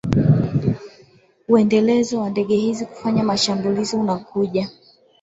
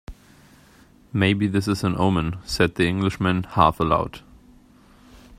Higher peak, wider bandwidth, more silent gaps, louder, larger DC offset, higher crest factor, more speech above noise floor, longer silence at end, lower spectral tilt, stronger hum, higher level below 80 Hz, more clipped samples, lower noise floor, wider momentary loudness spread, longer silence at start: about the same, -2 dBFS vs 0 dBFS; second, 8 kHz vs 15 kHz; neither; first, -19 LUFS vs -22 LUFS; neither; about the same, 18 dB vs 22 dB; about the same, 33 dB vs 31 dB; first, 0.5 s vs 0.05 s; about the same, -6.5 dB/octave vs -6 dB/octave; neither; about the same, -46 dBFS vs -44 dBFS; neither; about the same, -52 dBFS vs -52 dBFS; about the same, 9 LU vs 8 LU; about the same, 0.05 s vs 0.1 s